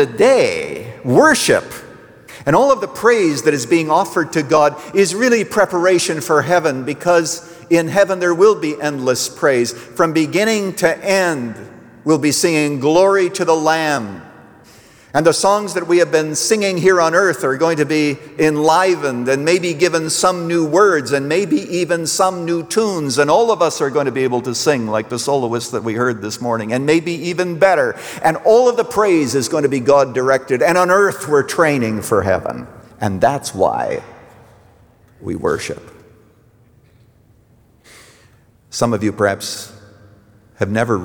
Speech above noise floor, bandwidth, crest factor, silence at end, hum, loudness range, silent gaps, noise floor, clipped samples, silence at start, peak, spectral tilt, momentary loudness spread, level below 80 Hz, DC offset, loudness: 36 dB; over 20 kHz; 14 dB; 0 s; none; 9 LU; none; -51 dBFS; under 0.1%; 0 s; -2 dBFS; -4.5 dB/octave; 9 LU; -56 dBFS; under 0.1%; -15 LUFS